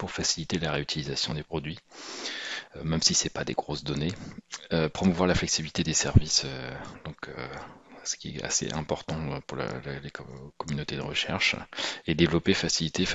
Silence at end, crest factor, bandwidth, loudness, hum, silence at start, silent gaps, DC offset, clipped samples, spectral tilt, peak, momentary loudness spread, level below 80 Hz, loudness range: 0 s; 24 dB; 8.2 kHz; -28 LUFS; none; 0 s; none; 0.1%; under 0.1%; -3.5 dB/octave; -4 dBFS; 17 LU; -46 dBFS; 6 LU